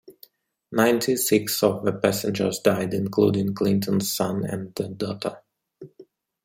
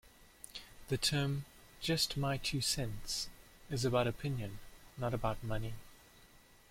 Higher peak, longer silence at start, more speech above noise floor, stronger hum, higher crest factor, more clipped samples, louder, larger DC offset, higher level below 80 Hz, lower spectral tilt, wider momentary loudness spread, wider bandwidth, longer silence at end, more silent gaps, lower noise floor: first, -4 dBFS vs -18 dBFS; about the same, 0.1 s vs 0.05 s; first, 32 dB vs 26 dB; neither; about the same, 22 dB vs 20 dB; neither; first, -23 LUFS vs -37 LUFS; neither; second, -64 dBFS vs -52 dBFS; about the same, -5 dB/octave vs -4 dB/octave; second, 9 LU vs 17 LU; about the same, 16.5 kHz vs 16.5 kHz; about the same, 0.4 s vs 0.35 s; neither; second, -55 dBFS vs -62 dBFS